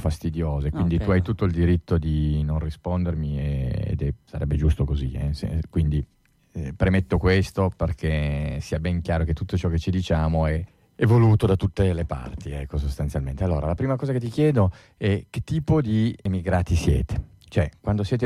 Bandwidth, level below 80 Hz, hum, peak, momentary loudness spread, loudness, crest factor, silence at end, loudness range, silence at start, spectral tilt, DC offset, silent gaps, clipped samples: 12 kHz; -32 dBFS; none; -10 dBFS; 8 LU; -24 LUFS; 14 dB; 0 s; 3 LU; 0 s; -8 dB/octave; under 0.1%; none; under 0.1%